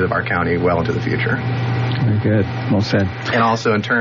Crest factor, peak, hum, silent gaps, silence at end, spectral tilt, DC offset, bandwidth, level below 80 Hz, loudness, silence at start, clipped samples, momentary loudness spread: 14 dB; -4 dBFS; none; none; 0 s; -5.5 dB/octave; under 0.1%; 7.2 kHz; -44 dBFS; -18 LUFS; 0 s; under 0.1%; 3 LU